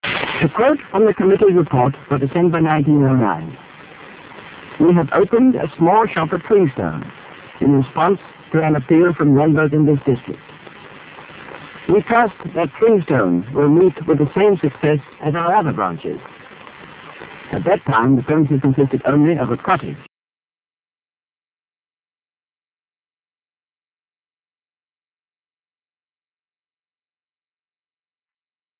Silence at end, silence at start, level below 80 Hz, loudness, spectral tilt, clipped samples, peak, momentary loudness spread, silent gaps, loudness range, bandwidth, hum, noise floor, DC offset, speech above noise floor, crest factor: 8.8 s; 0.05 s; -50 dBFS; -16 LUFS; -11.5 dB/octave; under 0.1%; -2 dBFS; 20 LU; none; 4 LU; 4 kHz; none; under -90 dBFS; under 0.1%; over 75 dB; 16 dB